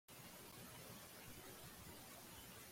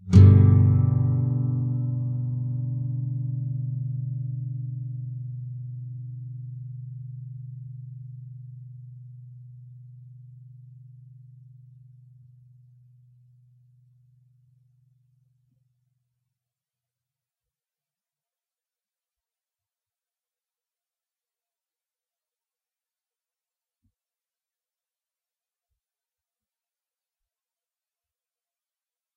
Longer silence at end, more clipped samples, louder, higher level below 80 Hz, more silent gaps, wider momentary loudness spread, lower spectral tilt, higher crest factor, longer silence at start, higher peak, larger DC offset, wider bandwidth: second, 0 s vs 18.45 s; neither; second, -56 LUFS vs -24 LUFS; second, -74 dBFS vs -54 dBFS; neither; second, 1 LU vs 27 LU; second, -3 dB/octave vs -11.5 dB/octave; second, 14 dB vs 26 dB; about the same, 0.1 s vs 0.05 s; second, -44 dBFS vs -2 dBFS; neither; first, 16.5 kHz vs 4.7 kHz